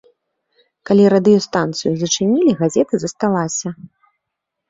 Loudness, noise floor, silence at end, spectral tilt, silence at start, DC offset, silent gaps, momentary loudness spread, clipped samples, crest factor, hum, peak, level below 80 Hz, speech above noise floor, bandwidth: -16 LUFS; -79 dBFS; 0.85 s; -5 dB/octave; 0.9 s; under 0.1%; none; 10 LU; under 0.1%; 16 dB; none; -2 dBFS; -58 dBFS; 64 dB; 7.8 kHz